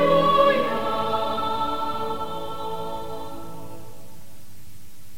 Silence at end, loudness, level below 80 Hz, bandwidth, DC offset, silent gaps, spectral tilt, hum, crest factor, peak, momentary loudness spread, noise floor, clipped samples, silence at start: 0 s; -24 LUFS; -50 dBFS; 16.5 kHz; 3%; none; -5.5 dB/octave; none; 20 dB; -6 dBFS; 22 LU; -48 dBFS; under 0.1%; 0 s